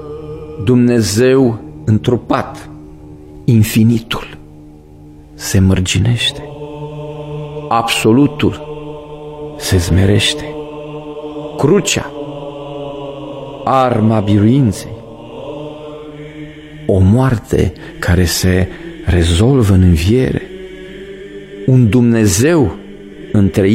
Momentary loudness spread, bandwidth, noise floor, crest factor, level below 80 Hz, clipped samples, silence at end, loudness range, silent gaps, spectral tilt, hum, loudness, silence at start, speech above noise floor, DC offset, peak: 20 LU; 16 kHz; -37 dBFS; 14 dB; -32 dBFS; under 0.1%; 0 s; 4 LU; none; -6 dB/octave; none; -13 LUFS; 0 s; 26 dB; under 0.1%; 0 dBFS